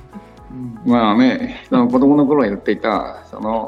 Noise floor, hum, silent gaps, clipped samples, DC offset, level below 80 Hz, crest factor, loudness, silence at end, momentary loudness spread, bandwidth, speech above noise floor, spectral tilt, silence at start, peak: -38 dBFS; none; none; under 0.1%; under 0.1%; -46 dBFS; 14 dB; -16 LUFS; 0 s; 17 LU; 6.4 kHz; 22 dB; -7.5 dB/octave; 0.15 s; -2 dBFS